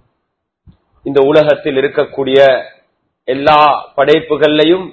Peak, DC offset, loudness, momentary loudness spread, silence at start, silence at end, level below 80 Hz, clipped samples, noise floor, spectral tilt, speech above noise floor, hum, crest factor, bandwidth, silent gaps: 0 dBFS; under 0.1%; -11 LUFS; 8 LU; 1.05 s; 0 s; -50 dBFS; 0.4%; -71 dBFS; -6.5 dB/octave; 60 dB; none; 12 dB; 8 kHz; none